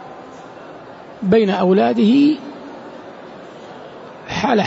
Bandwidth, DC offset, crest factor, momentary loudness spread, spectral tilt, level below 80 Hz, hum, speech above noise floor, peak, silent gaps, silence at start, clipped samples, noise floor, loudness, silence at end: 8 kHz; under 0.1%; 14 dB; 23 LU; -7 dB/octave; -56 dBFS; none; 23 dB; -4 dBFS; none; 0 s; under 0.1%; -37 dBFS; -16 LUFS; 0 s